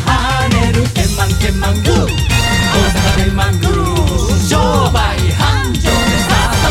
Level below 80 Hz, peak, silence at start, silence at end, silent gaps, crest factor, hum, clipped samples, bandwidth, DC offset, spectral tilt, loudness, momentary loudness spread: -20 dBFS; 0 dBFS; 0 s; 0 s; none; 12 dB; none; under 0.1%; 16.5 kHz; under 0.1%; -4.5 dB/octave; -13 LUFS; 2 LU